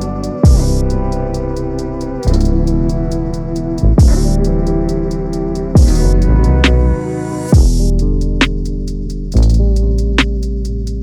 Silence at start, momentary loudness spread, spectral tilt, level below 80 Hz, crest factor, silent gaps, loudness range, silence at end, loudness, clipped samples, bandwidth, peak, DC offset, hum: 0 s; 10 LU; -6.5 dB/octave; -14 dBFS; 12 dB; none; 3 LU; 0 s; -15 LUFS; under 0.1%; 12.5 kHz; 0 dBFS; under 0.1%; none